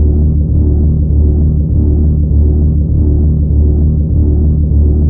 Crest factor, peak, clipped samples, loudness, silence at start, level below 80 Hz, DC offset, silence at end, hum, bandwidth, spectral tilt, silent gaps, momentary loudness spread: 8 dB; 0 dBFS; under 0.1%; -11 LUFS; 0 s; -10 dBFS; under 0.1%; 0 s; none; 1.1 kHz; -18 dB/octave; none; 1 LU